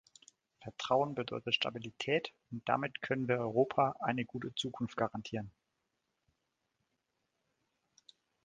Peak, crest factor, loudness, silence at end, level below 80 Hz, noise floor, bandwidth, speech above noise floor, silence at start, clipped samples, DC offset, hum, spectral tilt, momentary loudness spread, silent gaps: -14 dBFS; 24 dB; -35 LUFS; 2.95 s; -72 dBFS; -84 dBFS; 9 kHz; 49 dB; 0.6 s; under 0.1%; under 0.1%; none; -5 dB/octave; 11 LU; none